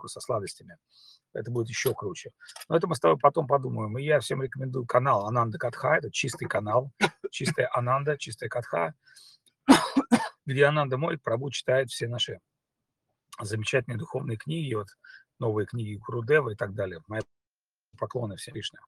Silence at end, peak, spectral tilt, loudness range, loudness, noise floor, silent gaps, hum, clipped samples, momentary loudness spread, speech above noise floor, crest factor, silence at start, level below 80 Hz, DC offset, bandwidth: 0.2 s; -2 dBFS; -5 dB/octave; 6 LU; -28 LUFS; under -90 dBFS; none; none; under 0.1%; 13 LU; over 62 dB; 26 dB; 0 s; -66 dBFS; under 0.1%; 15.5 kHz